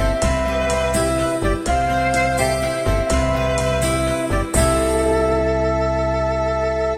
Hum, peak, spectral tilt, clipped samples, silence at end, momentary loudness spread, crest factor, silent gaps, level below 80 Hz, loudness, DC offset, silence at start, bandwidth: none; -4 dBFS; -5 dB/octave; under 0.1%; 0 s; 3 LU; 14 dB; none; -26 dBFS; -19 LUFS; 0.2%; 0 s; 16 kHz